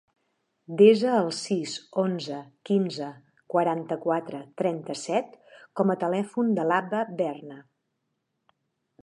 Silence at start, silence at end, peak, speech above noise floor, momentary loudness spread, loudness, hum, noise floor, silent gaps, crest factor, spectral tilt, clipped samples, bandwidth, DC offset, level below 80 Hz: 0.7 s; 1.4 s; -6 dBFS; 53 dB; 16 LU; -26 LUFS; none; -79 dBFS; none; 22 dB; -6 dB/octave; under 0.1%; 11 kHz; under 0.1%; -80 dBFS